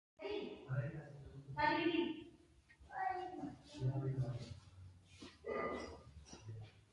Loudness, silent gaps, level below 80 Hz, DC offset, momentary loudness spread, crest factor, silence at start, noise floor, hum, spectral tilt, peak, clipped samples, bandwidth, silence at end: -43 LUFS; none; -66 dBFS; under 0.1%; 20 LU; 20 dB; 0.2 s; -67 dBFS; none; -7 dB/octave; -24 dBFS; under 0.1%; 10.5 kHz; 0.15 s